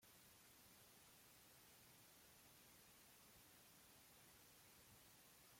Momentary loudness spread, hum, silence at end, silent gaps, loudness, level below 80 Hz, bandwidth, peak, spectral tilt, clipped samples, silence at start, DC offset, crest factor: 0 LU; none; 0 s; none; -67 LUFS; -86 dBFS; 16.5 kHz; -56 dBFS; -2 dB/octave; under 0.1%; 0 s; under 0.1%; 12 dB